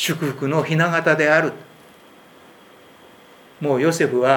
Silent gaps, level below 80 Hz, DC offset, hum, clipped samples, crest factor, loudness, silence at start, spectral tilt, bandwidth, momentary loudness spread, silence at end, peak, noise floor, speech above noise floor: none; -72 dBFS; under 0.1%; none; under 0.1%; 20 dB; -19 LUFS; 0 s; -5 dB/octave; 19.5 kHz; 10 LU; 0 s; 0 dBFS; -47 dBFS; 29 dB